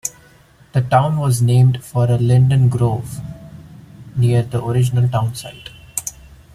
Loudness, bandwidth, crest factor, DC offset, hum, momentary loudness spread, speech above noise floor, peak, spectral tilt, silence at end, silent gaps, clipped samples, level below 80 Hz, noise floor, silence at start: -17 LUFS; 14.5 kHz; 16 dB; under 0.1%; none; 17 LU; 33 dB; 0 dBFS; -6.5 dB/octave; 0.45 s; none; under 0.1%; -46 dBFS; -48 dBFS; 0.05 s